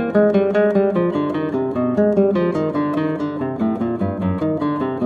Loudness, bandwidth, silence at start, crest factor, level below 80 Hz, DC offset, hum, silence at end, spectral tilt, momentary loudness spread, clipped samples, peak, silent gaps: -19 LUFS; 6.8 kHz; 0 s; 16 dB; -54 dBFS; under 0.1%; none; 0 s; -9.5 dB/octave; 6 LU; under 0.1%; -2 dBFS; none